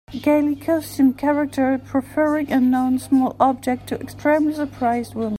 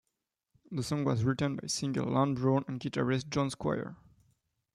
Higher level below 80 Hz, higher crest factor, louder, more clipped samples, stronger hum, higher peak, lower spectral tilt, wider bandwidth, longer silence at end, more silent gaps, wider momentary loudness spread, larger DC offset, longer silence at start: first, -52 dBFS vs -62 dBFS; about the same, 16 dB vs 18 dB; first, -20 LUFS vs -32 LUFS; neither; neither; first, -4 dBFS vs -16 dBFS; about the same, -6 dB/octave vs -6 dB/octave; first, 16 kHz vs 12.5 kHz; second, 0 s vs 0.8 s; neither; about the same, 6 LU vs 8 LU; neither; second, 0.1 s vs 0.7 s